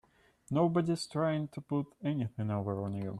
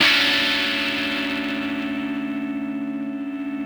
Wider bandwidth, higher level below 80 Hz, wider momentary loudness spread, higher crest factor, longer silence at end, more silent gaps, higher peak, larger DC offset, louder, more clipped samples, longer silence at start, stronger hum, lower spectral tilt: second, 12 kHz vs over 20 kHz; second, -68 dBFS vs -58 dBFS; second, 7 LU vs 12 LU; about the same, 16 dB vs 20 dB; about the same, 0 s vs 0 s; neither; second, -16 dBFS vs -4 dBFS; neither; second, -34 LUFS vs -22 LUFS; neither; first, 0.5 s vs 0 s; neither; first, -7.5 dB/octave vs -2.5 dB/octave